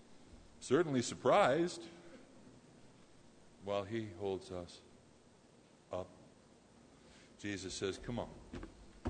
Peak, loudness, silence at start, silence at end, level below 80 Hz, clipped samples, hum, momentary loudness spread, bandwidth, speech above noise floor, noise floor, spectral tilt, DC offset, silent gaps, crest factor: -18 dBFS; -38 LUFS; 0.1 s; 0 s; -66 dBFS; under 0.1%; none; 23 LU; 9.6 kHz; 28 dB; -65 dBFS; -5 dB/octave; under 0.1%; none; 24 dB